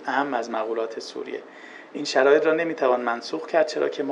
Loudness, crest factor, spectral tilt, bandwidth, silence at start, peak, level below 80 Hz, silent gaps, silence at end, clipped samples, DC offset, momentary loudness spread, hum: -24 LUFS; 18 dB; -3.5 dB/octave; 9.6 kHz; 0 s; -6 dBFS; under -90 dBFS; none; 0 s; under 0.1%; under 0.1%; 17 LU; none